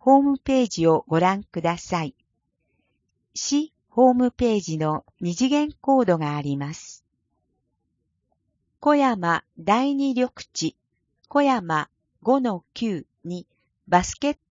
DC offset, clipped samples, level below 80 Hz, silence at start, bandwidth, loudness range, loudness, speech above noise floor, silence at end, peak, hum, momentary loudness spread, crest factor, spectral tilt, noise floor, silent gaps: under 0.1%; under 0.1%; -54 dBFS; 0.05 s; 7.6 kHz; 4 LU; -23 LUFS; 53 dB; 0.15 s; -4 dBFS; none; 11 LU; 20 dB; -5.5 dB/octave; -75 dBFS; none